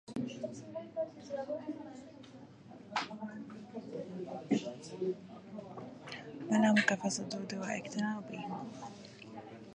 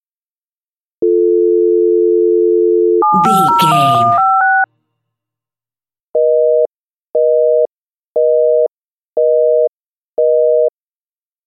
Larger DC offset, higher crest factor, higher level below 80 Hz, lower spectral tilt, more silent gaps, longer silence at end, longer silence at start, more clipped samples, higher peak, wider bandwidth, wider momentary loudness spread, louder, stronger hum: neither; first, 24 dB vs 14 dB; second, -78 dBFS vs -68 dBFS; second, -4.5 dB/octave vs -6 dB/octave; second, none vs 6.03-6.14 s, 6.75-7.03 s, 7.09-7.13 s, 7.71-8.15 s, 8.71-9.13 s, 9.69-10.09 s; second, 0 s vs 0.8 s; second, 0.05 s vs 1 s; neither; second, -14 dBFS vs 0 dBFS; second, 10 kHz vs 14 kHz; first, 18 LU vs 9 LU; second, -37 LUFS vs -12 LUFS; neither